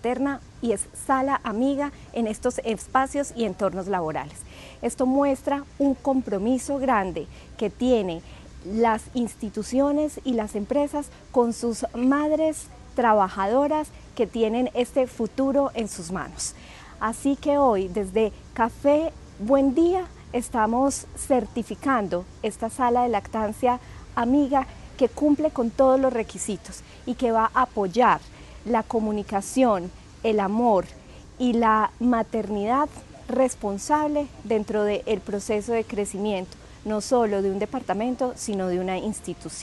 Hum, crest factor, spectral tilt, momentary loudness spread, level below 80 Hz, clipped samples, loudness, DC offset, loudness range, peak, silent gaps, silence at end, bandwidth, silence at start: none; 18 dB; -5 dB/octave; 10 LU; -48 dBFS; under 0.1%; -24 LUFS; under 0.1%; 3 LU; -6 dBFS; none; 0 s; 12.5 kHz; 0.05 s